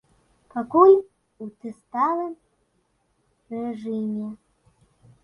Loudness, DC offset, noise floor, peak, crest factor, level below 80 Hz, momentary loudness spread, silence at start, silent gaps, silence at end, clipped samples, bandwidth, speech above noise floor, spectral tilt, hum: -22 LUFS; under 0.1%; -69 dBFS; -4 dBFS; 22 dB; -68 dBFS; 24 LU; 0.55 s; none; 0.9 s; under 0.1%; 5.4 kHz; 47 dB; -9 dB/octave; none